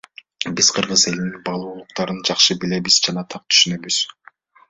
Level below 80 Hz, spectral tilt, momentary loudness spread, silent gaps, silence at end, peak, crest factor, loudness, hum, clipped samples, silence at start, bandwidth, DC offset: -58 dBFS; -2 dB/octave; 13 LU; none; 0.6 s; 0 dBFS; 20 dB; -17 LUFS; none; under 0.1%; 0.4 s; 8.4 kHz; under 0.1%